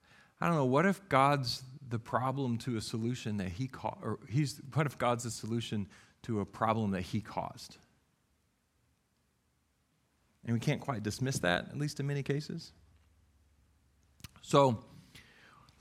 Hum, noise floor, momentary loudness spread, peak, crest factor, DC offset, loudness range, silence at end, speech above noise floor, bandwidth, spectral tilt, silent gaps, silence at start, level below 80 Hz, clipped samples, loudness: none; -76 dBFS; 14 LU; -10 dBFS; 24 dB; under 0.1%; 9 LU; 0.6 s; 43 dB; 15.5 kHz; -5.5 dB/octave; none; 0.4 s; -66 dBFS; under 0.1%; -34 LUFS